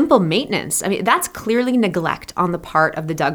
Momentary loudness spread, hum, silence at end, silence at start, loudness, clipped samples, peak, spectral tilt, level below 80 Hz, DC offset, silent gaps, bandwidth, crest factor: 5 LU; none; 0 s; 0 s; -18 LUFS; under 0.1%; 0 dBFS; -4.5 dB/octave; -50 dBFS; under 0.1%; none; over 20 kHz; 18 dB